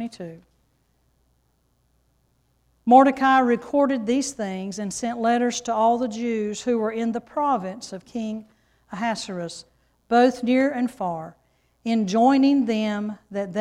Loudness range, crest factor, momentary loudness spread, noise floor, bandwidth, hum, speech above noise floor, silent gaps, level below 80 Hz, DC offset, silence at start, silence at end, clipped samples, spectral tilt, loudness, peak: 6 LU; 20 dB; 17 LU; -67 dBFS; 12 kHz; none; 45 dB; none; -62 dBFS; under 0.1%; 0 s; 0 s; under 0.1%; -5 dB/octave; -22 LUFS; -2 dBFS